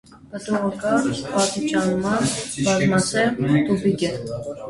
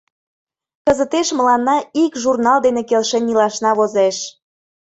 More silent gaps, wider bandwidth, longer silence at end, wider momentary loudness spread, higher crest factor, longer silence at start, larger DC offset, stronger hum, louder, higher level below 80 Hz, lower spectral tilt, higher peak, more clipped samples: neither; first, 11.5 kHz vs 8.2 kHz; second, 0 s vs 0.55 s; first, 7 LU vs 4 LU; about the same, 16 dB vs 16 dB; second, 0.1 s vs 0.85 s; neither; neither; second, -21 LUFS vs -16 LUFS; about the same, -52 dBFS vs -54 dBFS; first, -5 dB/octave vs -3.5 dB/octave; second, -6 dBFS vs -2 dBFS; neither